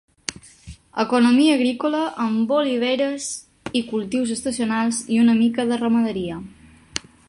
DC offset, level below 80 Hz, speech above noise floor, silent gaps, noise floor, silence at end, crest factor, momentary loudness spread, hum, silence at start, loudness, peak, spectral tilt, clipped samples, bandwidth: under 0.1%; -54 dBFS; 24 dB; none; -43 dBFS; 0.3 s; 20 dB; 15 LU; none; 0.3 s; -21 LUFS; -2 dBFS; -4 dB/octave; under 0.1%; 11.5 kHz